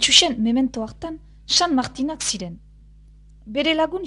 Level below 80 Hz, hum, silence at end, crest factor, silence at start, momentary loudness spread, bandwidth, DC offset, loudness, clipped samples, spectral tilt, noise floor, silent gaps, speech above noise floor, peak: -46 dBFS; none; 0 s; 22 dB; 0 s; 19 LU; 11 kHz; under 0.1%; -20 LUFS; under 0.1%; -2 dB/octave; -47 dBFS; none; 26 dB; 0 dBFS